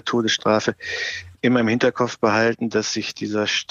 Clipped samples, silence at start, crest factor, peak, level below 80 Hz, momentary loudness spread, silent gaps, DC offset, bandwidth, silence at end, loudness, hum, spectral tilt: under 0.1%; 0.05 s; 16 dB; -6 dBFS; -60 dBFS; 7 LU; none; under 0.1%; 7.6 kHz; 0.1 s; -21 LUFS; none; -4 dB/octave